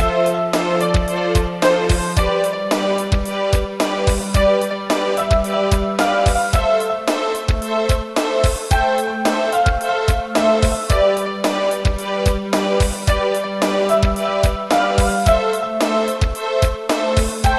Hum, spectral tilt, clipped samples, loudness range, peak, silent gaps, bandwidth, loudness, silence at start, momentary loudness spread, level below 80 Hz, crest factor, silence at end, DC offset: none; -5 dB/octave; under 0.1%; 1 LU; -2 dBFS; none; 13.5 kHz; -18 LUFS; 0 s; 4 LU; -24 dBFS; 14 dB; 0 s; 0.1%